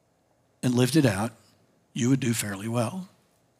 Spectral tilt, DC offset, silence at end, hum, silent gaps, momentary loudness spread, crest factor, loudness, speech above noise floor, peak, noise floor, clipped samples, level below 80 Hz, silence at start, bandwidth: -5.5 dB/octave; under 0.1%; 0.55 s; none; none; 15 LU; 18 dB; -26 LUFS; 42 dB; -8 dBFS; -67 dBFS; under 0.1%; -72 dBFS; 0.65 s; 16 kHz